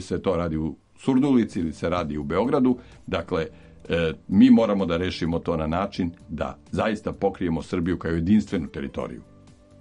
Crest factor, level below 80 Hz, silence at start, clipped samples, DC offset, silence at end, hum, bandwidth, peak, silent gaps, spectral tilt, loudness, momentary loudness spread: 18 dB; -44 dBFS; 0 s; under 0.1%; under 0.1%; 0.6 s; none; 9.8 kHz; -6 dBFS; none; -7.5 dB/octave; -24 LUFS; 12 LU